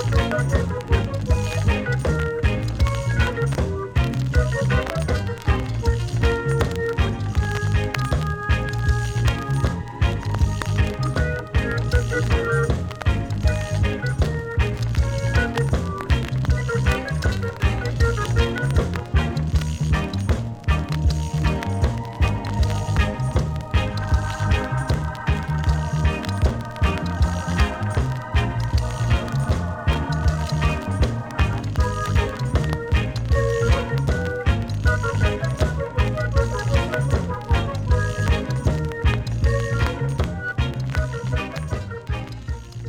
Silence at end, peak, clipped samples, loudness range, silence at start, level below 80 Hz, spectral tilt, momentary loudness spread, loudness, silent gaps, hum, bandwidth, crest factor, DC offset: 0 s; -2 dBFS; under 0.1%; 1 LU; 0 s; -26 dBFS; -6.5 dB/octave; 3 LU; -23 LUFS; none; none; 14 kHz; 18 dB; under 0.1%